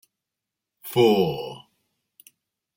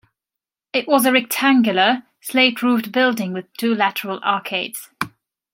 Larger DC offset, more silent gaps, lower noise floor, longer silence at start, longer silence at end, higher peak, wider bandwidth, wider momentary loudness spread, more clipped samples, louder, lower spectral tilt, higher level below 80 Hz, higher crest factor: neither; neither; about the same, -86 dBFS vs -86 dBFS; about the same, 0.85 s vs 0.75 s; first, 1.2 s vs 0.45 s; second, -6 dBFS vs -2 dBFS; about the same, 16.5 kHz vs 16.5 kHz; first, 23 LU vs 12 LU; neither; second, -22 LUFS vs -18 LUFS; first, -6 dB/octave vs -3.5 dB/octave; about the same, -64 dBFS vs -68 dBFS; about the same, 20 dB vs 18 dB